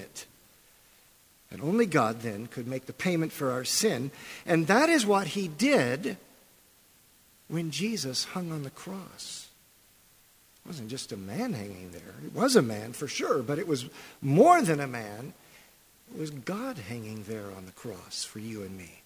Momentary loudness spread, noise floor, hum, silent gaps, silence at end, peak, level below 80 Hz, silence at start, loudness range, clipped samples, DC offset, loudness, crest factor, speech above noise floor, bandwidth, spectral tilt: 20 LU; -61 dBFS; none; none; 0.1 s; -6 dBFS; -66 dBFS; 0 s; 13 LU; under 0.1%; under 0.1%; -29 LUFS; 24 dB; 32 dB; 16 kHz; -4.5 dB/octave